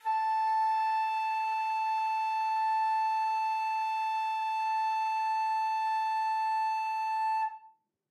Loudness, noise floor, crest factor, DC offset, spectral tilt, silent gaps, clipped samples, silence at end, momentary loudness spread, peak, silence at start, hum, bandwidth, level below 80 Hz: -30 LUFS; -61 dBFS; 8 dB; under 0.1%; 3.5 dB/octave; none; under 0.1%; 0.45 s; 3 LU; -22 dBFS; 0.05 s; none; 12 kHz; under -90 dBFS